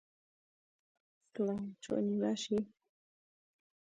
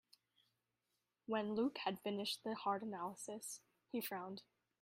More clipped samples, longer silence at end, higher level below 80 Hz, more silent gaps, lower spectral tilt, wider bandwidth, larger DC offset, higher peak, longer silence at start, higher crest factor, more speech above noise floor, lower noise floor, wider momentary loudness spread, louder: neither; first, 1.2 s vs 0.4 s; first, -76 dBFS vs -86 dBFS; neither; first, -6 dB/octave vs -4 dB/octave; second, 9.2 kHz vs 15.5 kHz; neither; first, -22 dBFS vs -28 dBFS; about the same, 1.35 s vs 1.3 s; about the same, 18 dB vs 18 dB; first, over 54 dB vs 45 dB; about the same, under -90 dBFS vs -89 dBFS; about the same, 10 LU vs 11 LU; first, -37 LUFS vs -44 LUFS